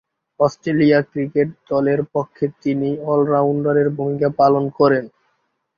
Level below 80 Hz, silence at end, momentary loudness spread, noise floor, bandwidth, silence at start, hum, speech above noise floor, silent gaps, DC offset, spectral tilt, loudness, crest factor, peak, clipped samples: -58 dBFS; 0.7 s; 6 LU; -68 dBFS; 7 kHz; 0.4 s; none; 51 dB; none; under 0.1%; -8.5 dB/octave; -18 LUFS; 16 dB; -2 dBFS; under 0.1%